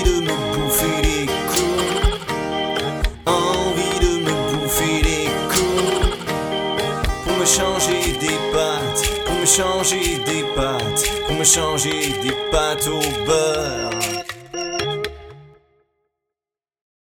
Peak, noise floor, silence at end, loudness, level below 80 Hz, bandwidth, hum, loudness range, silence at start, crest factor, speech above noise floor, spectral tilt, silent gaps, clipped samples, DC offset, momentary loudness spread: 0 dBFS; under -90 dBFS; 1.75 s; -19 LUFS; -30 dBFS; over 20 kHz; none; 5 LU; 0 s; 20 dB; over 71 dB; -3 dB/octave; none; under 0.1%; under 0.1%; 8 LU